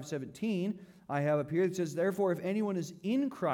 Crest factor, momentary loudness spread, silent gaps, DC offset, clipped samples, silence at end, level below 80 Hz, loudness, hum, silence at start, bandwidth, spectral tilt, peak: 12 dB; 7 LU; none; under 0.1%; under 0.1%; 0 s; -76 dBFS; -33 LUFS; none; 0 s; 18 kHz; -7 dB/octave; -20 dBFS